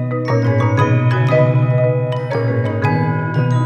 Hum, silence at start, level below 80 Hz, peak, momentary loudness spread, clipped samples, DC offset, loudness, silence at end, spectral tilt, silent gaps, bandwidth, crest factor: none; 0 s; -52 dBFS; -2 dBFS; 5 LU; under 0.1%; under 0.1%; -16 LUFS; 0 s; -8.5 dB/octave; none; 6.8 kHz; 14 dB